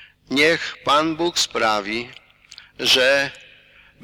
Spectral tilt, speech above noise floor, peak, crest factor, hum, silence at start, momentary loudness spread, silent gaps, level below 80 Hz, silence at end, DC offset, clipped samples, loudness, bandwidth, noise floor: -2 dB/octave; 31 dB; -6 dBFS; 16 dB; 50 Hz at -55 dBFS; 0 s; 12 LU; none; -56 dBFS; 0.65 s; under 0.1%; under 0.1%; -19 LUFS; 19.5 kHz; -51 dBFS